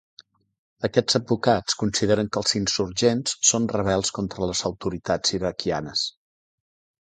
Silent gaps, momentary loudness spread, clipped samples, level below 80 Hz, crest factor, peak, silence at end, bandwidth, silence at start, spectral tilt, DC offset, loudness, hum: none; 7 LU; under 0.1%; -50 dBFS; 22 dB; -4 dBFS; 0.9 s; 9.6 kHz; 0.8 s; -3.5 dB/octave; under 0.1%; -23 LUFS; none